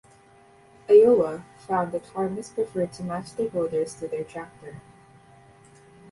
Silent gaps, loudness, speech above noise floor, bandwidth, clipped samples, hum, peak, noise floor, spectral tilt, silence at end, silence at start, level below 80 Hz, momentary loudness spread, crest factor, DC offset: none; -24 LUFS; 31 dB; 11.5 kHz; under 0.1%; none; -6 dBFS; -54 dBFS; -6.5 dB/octave; 1.3 s; 0.9 s; -62 dBFS; 22 LU; 20 dB; under 0.1%